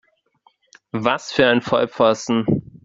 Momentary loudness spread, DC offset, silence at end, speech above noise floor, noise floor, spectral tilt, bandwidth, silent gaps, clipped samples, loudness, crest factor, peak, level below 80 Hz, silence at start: 6 LU; under 0.1%; 0.25 s; 42 dB; -60 dBFS; -5 dB/octave; 7.8 kHz; none; under 0.1%; -19 LUFS; 20 dB; 0 dBFS; -56 dBFS; 0.95 s